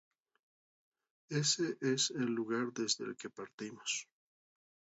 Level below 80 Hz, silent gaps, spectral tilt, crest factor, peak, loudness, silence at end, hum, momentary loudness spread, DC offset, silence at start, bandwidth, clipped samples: -84 dBFS; 3.54-3.58 s; -3.5 dB/octave; 20 dB; -18 dBFS; -36 LUFS; 0.9 s; none; 14 LU; under 0.1%; 1.3 s; 8 kHz; under 0.1%